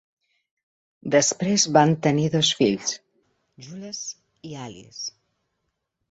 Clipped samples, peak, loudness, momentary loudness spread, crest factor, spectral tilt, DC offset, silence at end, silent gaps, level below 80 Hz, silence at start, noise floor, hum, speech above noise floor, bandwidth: under 0.1%; -4 dBFS; -21 LUFS; 20 LU; 22 dB; -4 dB/octave; under 0.1%; 1 s; none; -64 dBFS; 1.05 s; -78 dBFS; none; 55 dB; 8.2 kHz